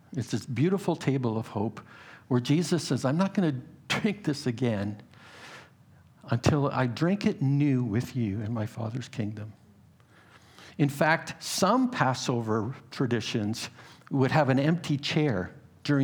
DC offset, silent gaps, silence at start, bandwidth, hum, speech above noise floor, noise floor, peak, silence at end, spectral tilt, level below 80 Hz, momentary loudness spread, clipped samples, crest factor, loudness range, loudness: under 0.1%; none; 0.1 s; over 20 kHz; none; 30 dB; -57 dBFS; -6 dBFS; 0 s; -6 dB/octave; -64 dBFS; 14 LU; under 0.1%; 22 dB; 4 LU; -28 LUFS